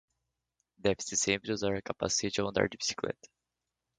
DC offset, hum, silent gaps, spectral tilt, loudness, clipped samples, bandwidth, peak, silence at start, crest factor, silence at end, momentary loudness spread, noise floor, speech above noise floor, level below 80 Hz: under 0.1%; none; none; -3 dB/octave; -32 LUFS; under 0.1%; 10 kHz; -12 dBFS; 0.85 s; 22 dB; 0.7 s; 6 LU; -87 dBFS; 55 dB; -60 dBFS